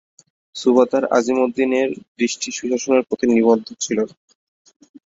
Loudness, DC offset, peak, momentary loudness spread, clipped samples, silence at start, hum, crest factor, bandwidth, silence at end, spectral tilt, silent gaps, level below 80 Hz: -19 LUFS; under 0.1%; -2 dBFS; 8 LU; under 0.1%; 0.55 s; none; 18 dB; 7.8 kHz; 1.05 s; -4 dB/octave; 2.08-2.15 s; -62 dBFS